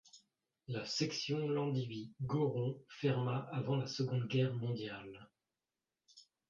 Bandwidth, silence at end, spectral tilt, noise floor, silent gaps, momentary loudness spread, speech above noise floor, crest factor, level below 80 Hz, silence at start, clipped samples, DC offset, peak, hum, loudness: 7.6 kHz; 0.3 s; -6 dB/octave; under -90 dBFS; none; 10 LU; over 52 dB; 18 dB; -74 dBFS; 0.15 s; under 0.1%; under 0.1%; -22 dBFS; none; -38 LUFS